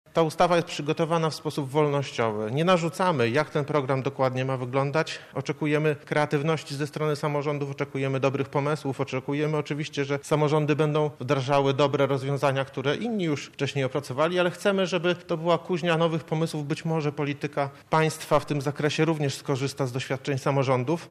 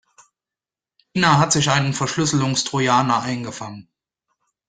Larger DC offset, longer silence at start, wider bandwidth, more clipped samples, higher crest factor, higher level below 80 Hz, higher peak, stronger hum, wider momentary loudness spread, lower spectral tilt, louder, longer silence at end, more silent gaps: neither; second, 0.15 s vs 1.15 s; first, 14 kHz vs 9.6 kHz; neither; about the same, 16 dB vs 20 dB; second, -62 dBFS vs -54 dBFS; second, -10 dBFS vs -2 dBFS; neither; second, 6 LU vs 13 LU; first, -6 dB/octave vs -4 dB/octave; second, -26 LUFS vs -19 LUFS; second, 0 s vs 0.85 s; neither